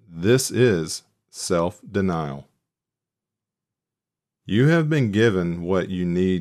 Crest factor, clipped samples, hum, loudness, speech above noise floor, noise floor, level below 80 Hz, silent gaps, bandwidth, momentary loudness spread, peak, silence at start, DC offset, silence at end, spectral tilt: 18 dB; under 0.1%; none; -22 LUFS; 67 dB; -88 dBFS; -54 dBFS; none; 15 kHz; 14 LU; -6 dBFS; 0.1 s; under 0.1%; 0 s; -6 dB/octave